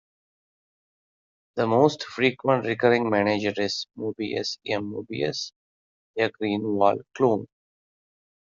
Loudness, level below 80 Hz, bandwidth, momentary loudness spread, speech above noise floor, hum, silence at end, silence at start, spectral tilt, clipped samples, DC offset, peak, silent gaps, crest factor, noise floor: -25 LUFS; -68 dBFS; 7.6 kHz; 10 LU; over 66 dB; none; 1.1 s; 1.55 s; -4 dB/octave; under 0.1%; under 0.1%; -4 dBFS; 5.56-6.14 s; 22 dB; under -90 dBFS